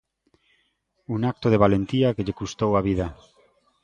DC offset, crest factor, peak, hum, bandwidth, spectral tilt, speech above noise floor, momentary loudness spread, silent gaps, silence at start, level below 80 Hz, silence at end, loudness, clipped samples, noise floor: under 0.1%; 22 dB; -4 dBFS; none; 9.2 kHz; -7.5 dB/octave; 48 dB; 10 LU; none; 1.1 s; -46 dBFS; 0.7 s; -23 LUFS; under 0.1%; -70 dBFS